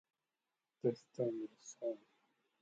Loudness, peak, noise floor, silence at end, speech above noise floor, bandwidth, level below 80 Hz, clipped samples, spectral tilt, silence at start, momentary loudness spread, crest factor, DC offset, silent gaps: -43 LUFS; -24 dBFS; under -90 dBFS; 0.65 s; over 49 dB; 8 kHz; under -90 dBFS; under 0.1%; -7 dB/octave; 0.85 s; 9 LU; 20 dB; under 0.1%; none